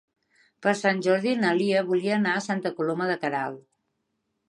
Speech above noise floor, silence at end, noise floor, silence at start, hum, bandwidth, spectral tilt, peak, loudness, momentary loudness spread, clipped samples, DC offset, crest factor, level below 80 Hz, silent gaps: 53 dB; 0.9 s; -77 dBFS; 0.6 s; none; 11.5 kHz; -5.5 dB/octave; -10 dBFS; -25 LUFS; 6 LU; under 0.1%; under 0.1%; 18 dB; -78 dBFS; none